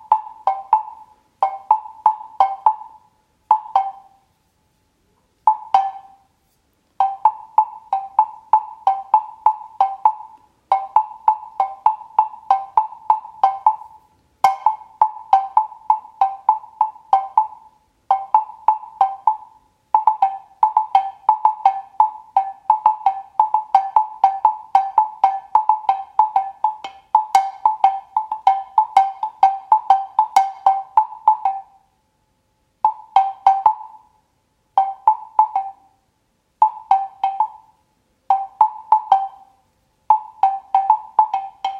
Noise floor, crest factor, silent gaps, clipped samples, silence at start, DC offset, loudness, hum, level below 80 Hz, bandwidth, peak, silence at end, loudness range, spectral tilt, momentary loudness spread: -66 dBFS; 18 dB; none; under 0.1%; 0.1 s; under 0.1%; -19 LUFS; none; -68 dBFS; 11.5 kHz; 0 dBFS; 0 s; 4 LU; -1.5 dB/octave; 6 LU